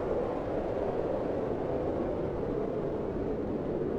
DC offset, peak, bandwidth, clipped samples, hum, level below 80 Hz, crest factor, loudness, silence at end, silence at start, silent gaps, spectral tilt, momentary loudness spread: under 0.1%; -18 dBFS; 8.6 kHz; under 0.1%; none; -46 dBFS; 14 dB; -33 LUFS; 0 s; 0 s; none; -9 dB/octave; 2 LU